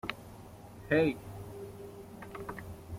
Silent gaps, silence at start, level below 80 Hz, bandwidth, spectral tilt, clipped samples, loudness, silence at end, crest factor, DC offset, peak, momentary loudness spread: none; 0.05 s; -58 dBFS; 16.5 kHz; -6.5 dB/octave; under 0.1%; -35 LUFS; 0 s; 22 dB; under 0.1%; -14 dBFS; 22 LU